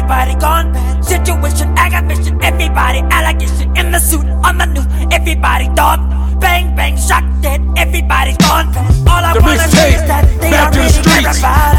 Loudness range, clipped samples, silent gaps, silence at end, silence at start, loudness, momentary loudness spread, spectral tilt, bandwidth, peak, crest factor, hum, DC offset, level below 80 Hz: 3 LU; 0.2%; none; 0 s; 0 s; -11 LUFS; 5 LU; -4.5 dB/octave; 16.5 kHz; 0 dBFS; 10 dB; none; under 0.1%; -12 dBFS